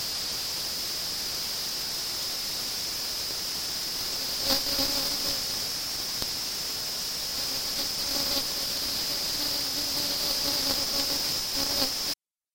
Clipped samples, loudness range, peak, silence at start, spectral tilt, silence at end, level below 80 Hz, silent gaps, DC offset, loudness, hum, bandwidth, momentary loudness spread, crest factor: under 0.1%; 3 LU; -8 dBFS; 0 s; -0.5 dB/octave; 0.4 s; -52 dBFS; none; under 0.1%; -27 LUFS; none; 17 kHz; 4 LU; 22 dB